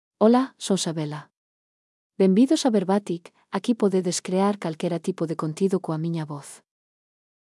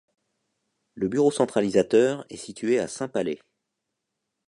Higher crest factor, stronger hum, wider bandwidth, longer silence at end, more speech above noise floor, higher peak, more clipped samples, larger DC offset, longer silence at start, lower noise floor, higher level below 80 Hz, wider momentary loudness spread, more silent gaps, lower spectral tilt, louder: about the same, 18 dB vs 20 dB; neither; about the same, 12 kHz vs 11 kHz; second, 0.85 s vs 1.15 s; first, over 67 dB vs 58 dB; about the same, -6 dBFS vs -6 dBFS; neither; neither; second, 0.2 s vs 0.95 s; first, under -90 dBFS vs -82 dBFS; second, -84 dBFS vs -64 dBFS; about the same, 14 LU vs 12 LU; first, 1.37-2.10 s vs none; about the same, -6 dB/octave vs -5.5 dB/octave; about the same, -24 LUFS vs -24 LUFS